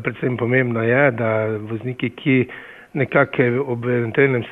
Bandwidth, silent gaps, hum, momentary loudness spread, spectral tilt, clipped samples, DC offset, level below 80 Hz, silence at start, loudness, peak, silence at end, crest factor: 3.9 kHz; none; none; 10 LU; -9.5 dB/octave; under 0.1%; under 0.1%; -60 dBFS; 0 s; -19 LUFS; -4 dBFS; 0 s; 16 dB